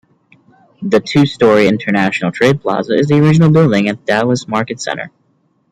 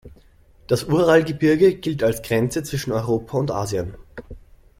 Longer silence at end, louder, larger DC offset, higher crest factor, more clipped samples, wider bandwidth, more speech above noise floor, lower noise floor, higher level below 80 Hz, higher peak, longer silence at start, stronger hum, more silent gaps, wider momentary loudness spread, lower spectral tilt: first, 0.65 s vs 0.4 s; first, -13 LUFS vs -20 LUFS; neither; second, 12 dB vs 18 dB; neither; second, 10 kHz vs 16.5 kHz; first, 46 dB vs 32 dB; first, -59 dBFS vs -52 dBFS; about the same, -50 dBFS vs -46 dBFS; about the same, 0 dBFS vs -2 dBFS; first, 0.8 s vs 0.05 s; neither; neither; about the same, 11 LU vs 13 LU; about the same, -6.5 dB/octave vs -6 dB/octave